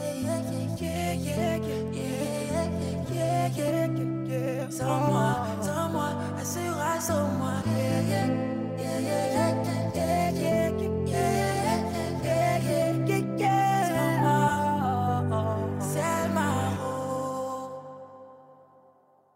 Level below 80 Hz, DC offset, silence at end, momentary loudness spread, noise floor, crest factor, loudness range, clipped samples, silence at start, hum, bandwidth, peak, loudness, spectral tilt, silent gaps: -54 dBFS; under 0.1%; 0.85 s; 6 LU; -61 dBFS; 14 dB; 4 LU; under 0.1%; 0 s; none; 16 kHz; -12 dBFS; -28 LUFS; -6 dB/octave; none